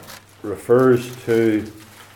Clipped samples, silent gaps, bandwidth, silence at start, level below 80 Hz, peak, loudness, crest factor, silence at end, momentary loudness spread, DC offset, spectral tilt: under 0.1%; none; 18 kHz; 0 s; -60 dBFS; -4 dBFS; -18 LUFS; 16 dB; 0.35 s; 18 LU; under 0.1%; -7 dB/octave